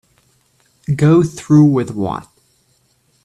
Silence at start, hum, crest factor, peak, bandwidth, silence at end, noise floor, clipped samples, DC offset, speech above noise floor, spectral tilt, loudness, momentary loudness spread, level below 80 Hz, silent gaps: 0.9 s; none; 16 dB; 0 dBFS; 11 kHz; 1 s; -59 dBFS; under 0.1%; under 0.1%; 46 dB; -8.5 dB/octave; -14 LUFS; 14 LU; -50 dBFS; none